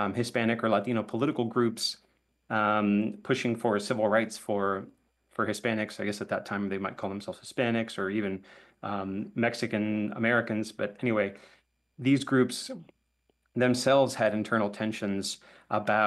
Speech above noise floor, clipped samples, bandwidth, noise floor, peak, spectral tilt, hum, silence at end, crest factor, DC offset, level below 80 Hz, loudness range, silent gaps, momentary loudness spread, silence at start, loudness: 45 dB; under 0.1%; 12.5 kHz; -74 dBFS; -12 dBFS; -5 dB/octave; none; 0 s; 18 dB; under 0.1%; -72 dBFS; 4 LU; none; 10 LU; 0 s; -29 LUFS